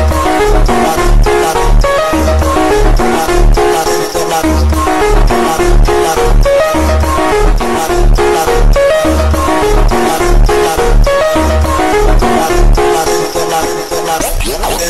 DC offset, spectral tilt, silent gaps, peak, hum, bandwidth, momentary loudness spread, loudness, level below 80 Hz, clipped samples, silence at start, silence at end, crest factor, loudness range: 2%; -5 dB/octave; none; 0 dBFS; none; 13.5 kHz; 3 LU; -11 LUFS; -12 dBFS; under 0.1%; 0 s; 0 s; 8 dB; 1 LU